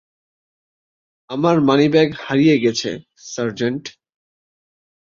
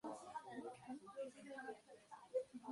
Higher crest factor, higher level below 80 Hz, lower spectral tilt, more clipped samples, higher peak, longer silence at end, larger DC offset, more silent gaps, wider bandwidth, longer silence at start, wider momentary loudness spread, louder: about the same, 18 dB vs 20 dB; first, -60 dBFS vs -90 dBFS; about the same, -5.5 dB/octave vs -4.5 dB/octave; neither; first, -2 dBFS vs -32 dBFS; first, 1.15 s vs 0 s; neither; neither; second, 7.6 kHz vs 11.5 kHz; first, 1.3 s vs 0.05 s; first, 16 LU vs 11 LU; first, -17 LUFS vs -52 LUFS